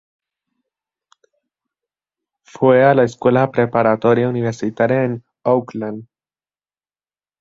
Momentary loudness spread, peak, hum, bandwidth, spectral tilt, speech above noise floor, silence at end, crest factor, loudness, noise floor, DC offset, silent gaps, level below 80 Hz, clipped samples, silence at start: 13 LU; -2 dBFS; none; 7.6 kHz; -8 dB/octave; over 75 dB; 1.4 s; 18 dB; -16 LUFS; under -90 dBFS; under 0.1%; none; -60 dBFS; under 0.1%; 2.6 s